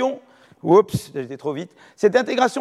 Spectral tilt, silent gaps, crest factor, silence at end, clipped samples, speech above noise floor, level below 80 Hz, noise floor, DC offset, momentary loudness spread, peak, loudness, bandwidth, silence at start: -5.5 dB/octave; none; 18 dB; 0 s; under 0.1%; 26 dB; -58 dBFS; -45 dBFS; under 0.1%; 16 LU; -2 dBFS; -20 LUFS; 13.5 kHz; 0 s